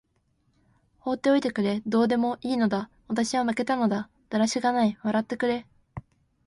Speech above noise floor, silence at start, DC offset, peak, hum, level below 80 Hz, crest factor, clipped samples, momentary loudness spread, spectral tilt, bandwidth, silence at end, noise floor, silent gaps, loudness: 45 dB; 1.05 s; under 0.1%; -10 dBFS; none; -62 dBFS; 16 dB; under 0.1%; 9 LU; -5 dB/octave; 11.5 kHz; 0.45 s; -70 dBFS; none; -26 LUFS